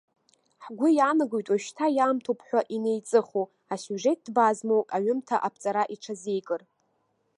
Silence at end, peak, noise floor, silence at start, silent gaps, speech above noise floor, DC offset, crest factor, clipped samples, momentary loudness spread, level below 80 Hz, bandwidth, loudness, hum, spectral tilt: 0.8 s; -8 dBFS; -72 dBFS; 0.6 s; none; 47 dB; under 0.1%; 18 dB; under 0.1%; 11 LU; -84 dBFS; 11.5 kHz; -27 LUFS; none; -5 dB/octave